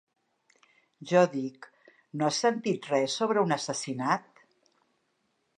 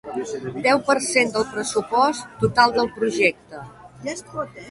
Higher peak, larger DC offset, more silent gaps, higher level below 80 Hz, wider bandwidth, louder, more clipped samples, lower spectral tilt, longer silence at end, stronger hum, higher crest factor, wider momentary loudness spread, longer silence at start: second, -8 dBFS vs -2 dBFS; neither; neither; second, -82 dBFS vs -54 dBFS; about the same, 11 kHz vs 11.5 kHz; second, -28 LUFS vs -21 LUFS; neither; about the same, -4.5 dB/octave vs -3.5 dB/octave; first, 1.4 s vs 0 s; neither; about the same, 22 dB vs 20 dB; second, 11 LU vs 14 LU; first, 1 s vs 0.05 s